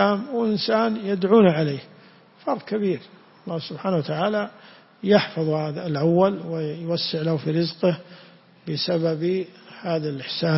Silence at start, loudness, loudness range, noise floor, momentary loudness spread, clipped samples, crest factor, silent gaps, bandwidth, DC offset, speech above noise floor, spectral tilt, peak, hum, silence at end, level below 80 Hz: 0 s; -23 LUFS; 3 LU; -51 dBFS; 12 LU; under 0.1%; 20 dB; none; 6 kHz; under 0.1%; 28 dB; -9.5 dB/octave; -4 dBFS; none; 0 s; -66 dBFS